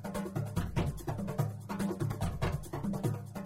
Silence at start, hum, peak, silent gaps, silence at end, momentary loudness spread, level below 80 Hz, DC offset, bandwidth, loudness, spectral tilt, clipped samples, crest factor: 0 s; none; -18 dBFS; none; 0 s; 3 LU; -48 dBFS; under 0.1%; 16 kHz; -36 LUFS; -7 dB/octave; under 0.1%; 16 dB